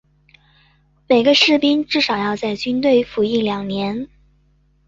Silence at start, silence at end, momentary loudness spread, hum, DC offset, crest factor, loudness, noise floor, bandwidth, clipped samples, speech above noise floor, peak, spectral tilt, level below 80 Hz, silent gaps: 1.1 s; 0.8 s; 11 LU; 50 Hz at -45 dBFS; under 0.1%; 18 dB; -17 LUFS; -58 dBFS; 7.6 kHz; under 0.1%; 41 dB; -2 dBFS; -4.5 dB/octave; -54 dBFS; none